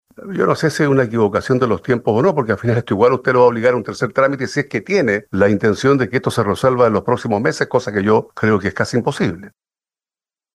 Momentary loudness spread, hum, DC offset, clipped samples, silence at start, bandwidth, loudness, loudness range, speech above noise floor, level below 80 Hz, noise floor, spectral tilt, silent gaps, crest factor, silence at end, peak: 6 LU; none; under 0.1%; under 0.1%; 0.2 s; 12.5 kHz; -16 LUFS; 2 LU; over 74 dB; -52 dBFS; under -90 dBFS; -6.5 dB/octave; none; 16 dB; 1.05 s; -2 dBFS